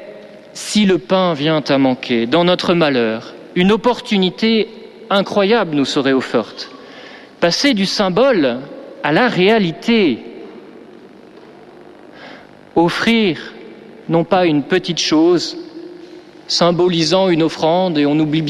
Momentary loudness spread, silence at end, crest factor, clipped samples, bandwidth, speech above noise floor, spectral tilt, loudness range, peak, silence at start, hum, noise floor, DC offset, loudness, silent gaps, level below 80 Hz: 20 LU; 0 s; 14 dB; under 0.1%; 13 kHz; 25 dB; -5 dB/octave; 5 LU; -2 dBFS; 0 s; none; -40 dBFS; under 0.1%; -15 LUFS; none; -52 dBFS